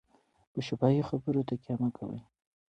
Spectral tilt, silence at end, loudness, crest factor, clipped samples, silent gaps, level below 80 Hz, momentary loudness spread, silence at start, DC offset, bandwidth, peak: -8.5 dB/octave; 0.45 s; -32 LUFS; 20 dB; under 0.1%; none; -66 dBFS; 14 LU; 0.55 s; under 0.1%; 8.2 kHz; -14 dBFS